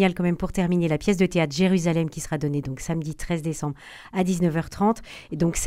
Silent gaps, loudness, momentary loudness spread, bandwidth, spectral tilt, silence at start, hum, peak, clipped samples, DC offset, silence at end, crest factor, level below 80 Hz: none; -25 LUFS; 9 LU; 15 kHz; -6 dB/octave; 0 s; none; -8 dBFS; under 0.1%; under 0.1%; 0 s; 16 dB; -42 dBFS